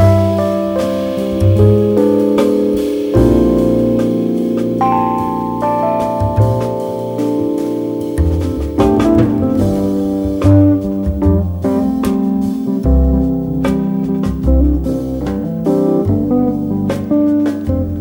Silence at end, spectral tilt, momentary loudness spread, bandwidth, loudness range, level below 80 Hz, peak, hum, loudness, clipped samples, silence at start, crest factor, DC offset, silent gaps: 0 s; -9 dB/octave; 7 LU; 19 kHz; 3 LU; -24 dBFS; 0 dBFS; none; -14 LUFS; under 0.1%; 0 s; 14 dB; under 0.1%; none